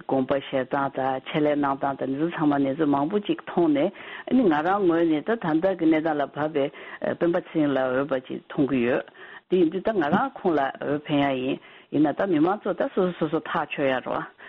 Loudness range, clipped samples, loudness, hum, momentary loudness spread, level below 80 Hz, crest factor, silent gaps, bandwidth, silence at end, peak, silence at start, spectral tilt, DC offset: 2 LU; under 0.1%; -25 LUFS; none; 7 LU; -62 dBFS; 18 dB; none; 4.7 kHz; 0 s; -6 dBFS; 0.1 s; -5 dB/octave; under 0.1%